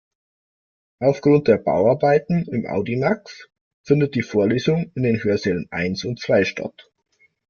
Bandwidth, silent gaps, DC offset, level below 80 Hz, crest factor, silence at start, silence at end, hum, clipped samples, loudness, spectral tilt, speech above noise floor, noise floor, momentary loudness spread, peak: 7 kHz; 3.61-3.84 s; under 0.1%; -56 dBFS; 18 dB; 1 s; 0.7 s; none; under 0.1%; -20 LUFS; -7 dB/octave; over 71 dB; under -90 dBFS; 8 LU; -2 dBFS